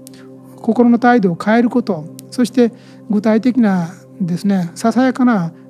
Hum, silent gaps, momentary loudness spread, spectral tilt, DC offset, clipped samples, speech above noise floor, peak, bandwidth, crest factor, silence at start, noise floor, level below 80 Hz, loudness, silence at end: none; none; 11 LU; -7 dB/octave; under 0.1%; under 0.1%; 23 dB; 0 dBFS; 13 kHz; 16 dB; 0.1 s; -37 dBFS; -68 dBFS; -15 LUFS; 0.2 s